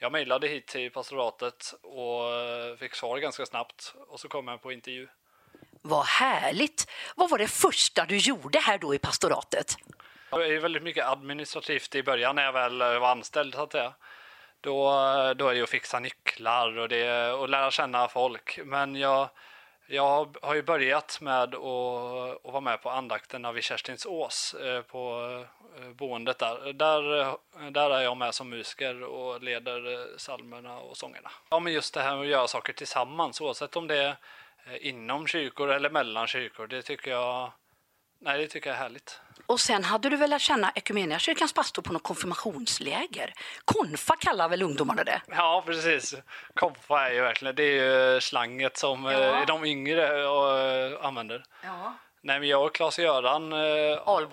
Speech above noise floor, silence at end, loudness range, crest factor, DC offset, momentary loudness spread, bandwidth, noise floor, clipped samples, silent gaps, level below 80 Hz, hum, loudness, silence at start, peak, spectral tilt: 42 dB; 0 s; 8 LU; 22 dB; under 0.1%; 13 LU; 16 kHz; -71 dBFS; under 0.1%; none; -68 dBFS; none; -28 LUFS; 0 s; -6 dBFS; -2.5 dB/octave